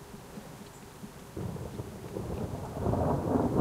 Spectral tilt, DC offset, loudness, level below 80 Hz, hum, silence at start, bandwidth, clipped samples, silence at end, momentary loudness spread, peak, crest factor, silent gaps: -7.5 dB/octave; under 0.1%; -34 LUFS; -48 dBFS; none; 0 s; 16 kHz; under 0.1%; 0 s; 18 LU; -14 dBFS; 20 dB; none